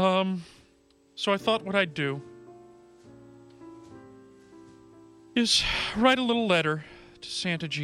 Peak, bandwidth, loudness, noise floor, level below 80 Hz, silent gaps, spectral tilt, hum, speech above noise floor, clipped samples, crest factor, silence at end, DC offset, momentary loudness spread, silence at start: -8 dBFS; 15 kHz; -26 LUFS; -62 dBFS; -54 dBFS; none; -4 dB/octave; none; 36 dB; under 0.1%; 20 dB; 0 s; under 0.1%; 25 LU; 0 s